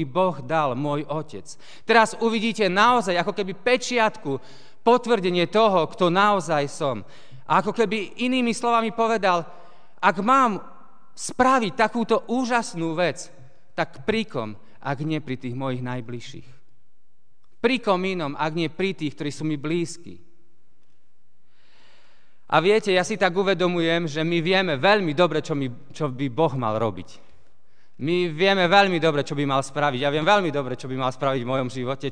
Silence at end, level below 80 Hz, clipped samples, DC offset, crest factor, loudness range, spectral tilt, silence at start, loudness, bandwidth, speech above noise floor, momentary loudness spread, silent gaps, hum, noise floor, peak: 0 s; -64 dBFS; under 0.1%; 1%; 22 dB; 8 LU; -5 dB/octave; 0 s; -22 LUFS; 10 kHz; 47 dB; 13 LU; none; none; -70 dBFS; -2 dBFS